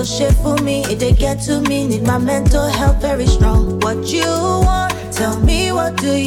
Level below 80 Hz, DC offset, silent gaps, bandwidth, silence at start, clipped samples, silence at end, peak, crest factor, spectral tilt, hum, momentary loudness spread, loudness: -18 dBFS; under 0.1%; none; 17 kHz; 0 s; under 0.1%; 0 s; 0 dBFS; 14 dB; -5.5 dB/octave; none; 3 LU; -16 LUFS